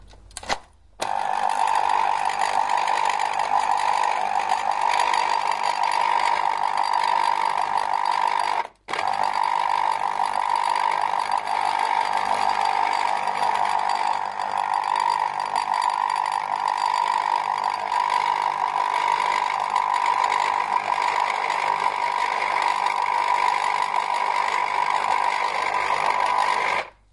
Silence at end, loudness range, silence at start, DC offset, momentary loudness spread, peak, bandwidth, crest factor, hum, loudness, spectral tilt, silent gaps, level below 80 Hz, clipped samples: 0.25 s; 1 LU; 0.1 s; under 0.1%; 3 LU; -6 dBFS; 11.5 kHz; 16 dB; none; -23 LUFS; -1 dB/octave; none; -60 dBFS; under 0.1%